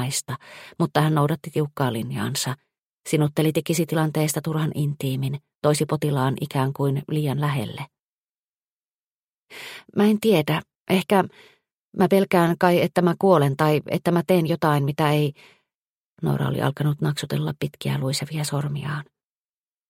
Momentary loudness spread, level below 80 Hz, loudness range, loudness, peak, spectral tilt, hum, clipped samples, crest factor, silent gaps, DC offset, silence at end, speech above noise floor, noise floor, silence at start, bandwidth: 11 LU; -62 dBFS; 6 LU; -23 LUFS; -2 dBFS; -6 dB/octave; none; under 0.1%; 20 dB; 2.79-3.04 s, 5.55-5.62 s, 8.00-9.48 s, 10.75-10.86 s, 11.74-11.88 s, 15.75-16.17 s; under 0.1%; 0.85 s; over 68 dB; under -90 dBFS; 0 s; 16.5 kHz